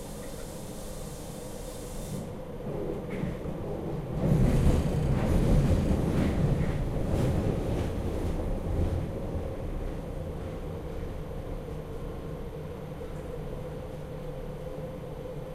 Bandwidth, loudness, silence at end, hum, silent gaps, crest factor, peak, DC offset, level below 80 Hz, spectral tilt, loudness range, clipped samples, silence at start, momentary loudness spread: 15.5 kHz; -32 LUFS; 0 s; none; none; 20 dB; -10 dBFS; under 0.1%; -36 dBFS; -7.5 dB/octave; 12 LU; under 0.1%; 0 s; 14 LU